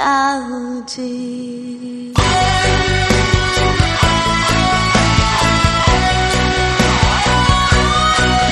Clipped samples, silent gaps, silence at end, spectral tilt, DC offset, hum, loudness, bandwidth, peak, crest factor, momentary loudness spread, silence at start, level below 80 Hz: under 0.1%; none; 0 s; -4 dB/octave; under 0.1%; none; -14 LUFS; 12.5 kHz; 0 dBFS; 14 dB; 12 LU; 0 s; -22 dBFS